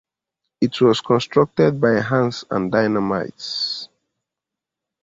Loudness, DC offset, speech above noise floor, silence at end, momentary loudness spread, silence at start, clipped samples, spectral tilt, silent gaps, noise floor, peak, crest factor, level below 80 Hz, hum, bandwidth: -19 LUFS; under 0.1%; 67 dB; 1.15 s; 8 LU; 0.6 s; under 0.1%; -6 dB/octave; none; -85 dBFS; -4 dBFS; 18 dB; -56 dBFS; none; 7.8 kHz